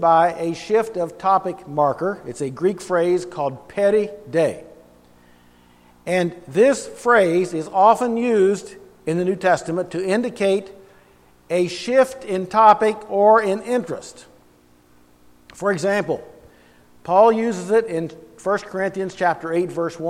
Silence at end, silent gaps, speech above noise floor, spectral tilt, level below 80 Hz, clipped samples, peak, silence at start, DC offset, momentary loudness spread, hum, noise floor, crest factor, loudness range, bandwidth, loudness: 0 s; none; 35 dB; -5.5 dB/octave; -60 dBFS; under 0.1%; 0 dBFS; 0 s; under 0.1%; 12 LU; 60 Hz at -50 dBFS; -54 dBFS; 20 dB; 5 LU; 14.5 kHz; -20 LUFS